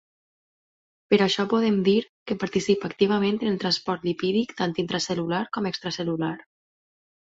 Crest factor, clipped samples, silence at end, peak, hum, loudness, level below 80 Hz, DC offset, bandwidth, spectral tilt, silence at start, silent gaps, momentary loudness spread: 20 dB; under 0.1%; 1 s; -6 dBFS; none; -25 LUFS; -64 dBFS; under 0.1%; 8 kHz; -5.5 dB/octave; 1.1 s; 2.09-2.26 s; 7 LU